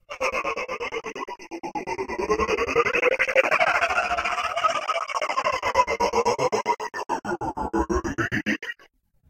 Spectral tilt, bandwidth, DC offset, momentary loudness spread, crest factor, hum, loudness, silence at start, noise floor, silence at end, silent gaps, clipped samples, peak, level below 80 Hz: -4 dB/octave; 16 kHz; under 0.1%; 11 LU; 22 dB; none; -24 LUFS; 0.1 s; -58 dBFS; 0.55 s; none; under 0.1%; -2 dBFS; -46 dBFS